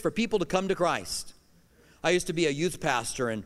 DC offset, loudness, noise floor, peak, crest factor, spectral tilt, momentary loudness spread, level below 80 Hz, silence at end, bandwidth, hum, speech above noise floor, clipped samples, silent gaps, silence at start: under 0.1%; -28 LUFS; -60 dBFS; -8 dBFS; 20 dB; -4 dB/octave; 6 LU; -52 dBFS; 0 s; 16 kHz; none; 32 dB; under 0.1%; none; 0 s